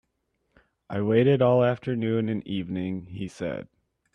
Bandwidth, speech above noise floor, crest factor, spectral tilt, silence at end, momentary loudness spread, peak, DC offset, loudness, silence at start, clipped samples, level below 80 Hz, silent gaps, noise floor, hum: 9.8 kHz; 51 dB; 18 dB; -8.5 dB/octave; 0.5 s; 14 LU; -10 dBFS; under 0.1%; -25 LUFS; 0.9 s; under 0.1%; -62 dBFS; none; -75 dBFS; none